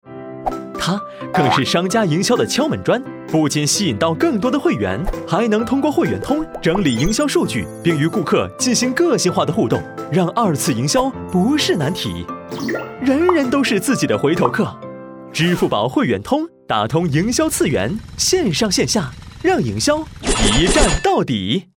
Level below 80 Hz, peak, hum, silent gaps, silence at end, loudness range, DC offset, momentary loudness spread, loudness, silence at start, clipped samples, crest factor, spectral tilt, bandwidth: -34 dBFS; 0 dBFS; none; none; 0.15 s; 2 LU; under 0.1%; 8 LU; -17 LUFS; 0.05 s; under 0.1%; 18 dB; -4.5 dB/octave; over 20 kHz